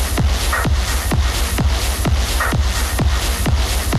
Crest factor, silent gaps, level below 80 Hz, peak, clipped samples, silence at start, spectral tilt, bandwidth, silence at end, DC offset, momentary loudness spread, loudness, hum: 10 dB; none; -18 dBFS; -6 dBFS; under 0.1%; 0 s; -4 dB/octave; 15.5 kHz; 0 s; under 0.1%; 1 LU; -18 LUFS; none